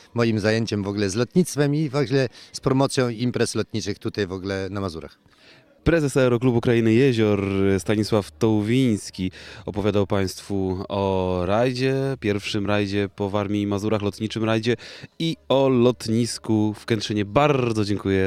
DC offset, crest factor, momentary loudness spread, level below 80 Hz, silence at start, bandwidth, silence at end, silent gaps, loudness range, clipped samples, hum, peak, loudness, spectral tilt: under 0.1%; 20 dB; 8 LU; -48 dBFS; 0.15 s; 14.5 kHz; 0 s; none; 4 LU; under 0.1%; none; -2 dBFS; -23 LUFS; -6 dB/octave